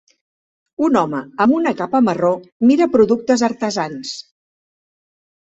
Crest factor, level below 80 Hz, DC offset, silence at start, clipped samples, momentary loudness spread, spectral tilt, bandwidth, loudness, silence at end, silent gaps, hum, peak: 16 dB; -58 dBFS; under 0.1%; 0.8 s; under 0.1%; 12 LU; -5.5 dB/octave; 8 kHz; -17 LUFS; 1.35 s; 2.52-2.60 s; none; -2 dBFS